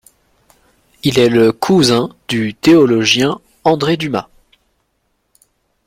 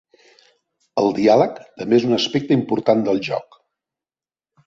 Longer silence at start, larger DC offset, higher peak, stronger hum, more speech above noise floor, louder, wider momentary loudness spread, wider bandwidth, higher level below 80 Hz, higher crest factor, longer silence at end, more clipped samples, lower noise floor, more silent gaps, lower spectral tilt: about the same, 1.05 s vs 0.95 s; neither; about the same, 0 dBFS vs -2 dBFS; neither; second, 53 dB vs over 72 dB; first, -13 LUFS vs -19 LUFS; about the same, 10 LU vs 11 LU; first, 16 kHz vs 7.6 kHz; first, -50 dBFS vs -62 dBFS; about the same, 14 dB vs 18 dB; first, 1.65 s vs 1.25 s; neither; second, -65 dBFS vs under -90 dBFS; neither; about the same, -5 dB/octave vs -6 dB/octave